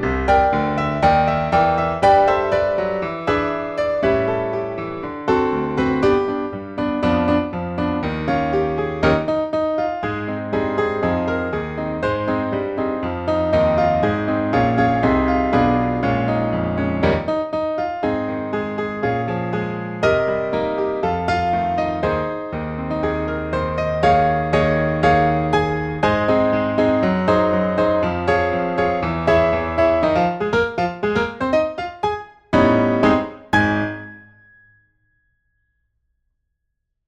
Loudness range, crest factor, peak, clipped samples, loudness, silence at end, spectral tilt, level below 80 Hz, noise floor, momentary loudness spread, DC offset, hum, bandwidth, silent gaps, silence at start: 4 LU; 16 dB; -4 dBFS; under 0.1%; -19 LUFS; 2.85 s; -7.5 dB/octave; -38 dBFS; -75 dBFS; 8 LU; under 0.1%; none; 9.4 kHz; none; 0 s